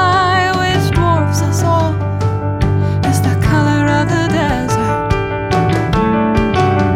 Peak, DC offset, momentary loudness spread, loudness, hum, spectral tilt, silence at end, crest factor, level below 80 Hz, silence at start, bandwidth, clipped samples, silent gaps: 0 dBFS; under 0.1%; 4 LU; -14 LUFS; none; -6 dB/octave; 0 s; 12 dB; -28 dBFS; 0 s; 15.5 kHz; under 0.1%; none